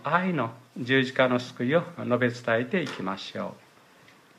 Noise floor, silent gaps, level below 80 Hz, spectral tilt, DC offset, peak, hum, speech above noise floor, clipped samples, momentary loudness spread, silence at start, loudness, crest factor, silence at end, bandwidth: -56 dBFS; none; -72 dBFS; -6 dB/octave; under 0.1%; -8 dBFS; none; 29 dB; under 0.1%; 11 LU; 0 s; -27 LUFS; 20 dB; 0.8 s; 12.5 kHz